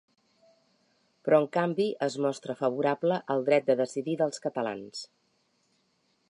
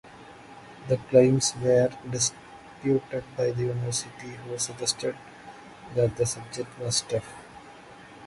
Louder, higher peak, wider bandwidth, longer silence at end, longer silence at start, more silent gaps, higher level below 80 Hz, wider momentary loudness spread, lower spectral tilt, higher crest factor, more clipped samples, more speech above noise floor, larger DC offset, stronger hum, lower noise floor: about the same, -28 LUFS vs -26 LUFS; second, -10 dBFS vs -6 dBFS; about the same, 11 kHz vs 11.5 kHz; first, 1.25 s vs 0 s; first, 1.25 s vs 0.05 s; neither; second, -82 dBFS vs -58 dBFS; second, 13 LU vs 24 LU; about the same, -5.5 dB/octave vs -4.5 dB/octave; about the same, 20 dB vs 22 dB; neither; first, 44 dB vs 21 dB; neither; neither; first, -72 dBFS vs -48 dBFS